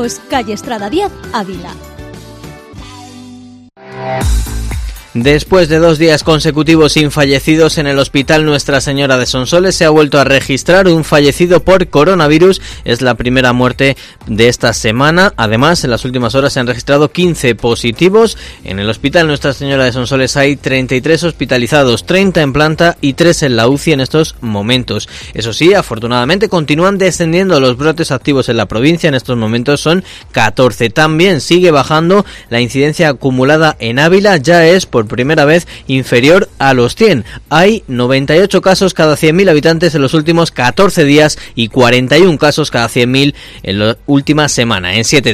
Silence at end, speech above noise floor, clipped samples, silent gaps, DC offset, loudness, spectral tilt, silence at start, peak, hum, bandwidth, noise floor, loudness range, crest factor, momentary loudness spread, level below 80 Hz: 0 s; 25 dB; 1%; none; under 0.1%; -10 LUFS; -5 dB/octave; 0 s; 0 dBFS; none; 16 kHz; -35 dBFS; 3 LU; 10 dB; 9 LU; -30 dBFS